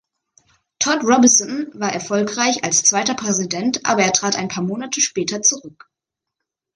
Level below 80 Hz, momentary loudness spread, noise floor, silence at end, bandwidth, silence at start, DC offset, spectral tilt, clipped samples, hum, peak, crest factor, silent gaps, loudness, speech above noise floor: -62 dBFS; 10 LU; -81 dBFS; 1.05 s; 11 kHz; 0.8 s; under 0.1%; -2 dB/octave; under 0.1%; none; 0 dBFS; 20 dB; none; -17 LUFS; 63 dB